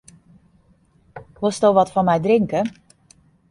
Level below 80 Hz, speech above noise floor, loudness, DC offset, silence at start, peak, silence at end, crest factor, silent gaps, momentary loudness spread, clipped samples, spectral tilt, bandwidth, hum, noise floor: -56 dBFS; 40 dB; -19 LUFS; under 0.1%; 1.15 s; -2 dBFS; 0.8 s; 18 dB; none; 8 LU; under 0.1%; -6.5 dB/octave; 11.5 kHz; none; -57 dBFS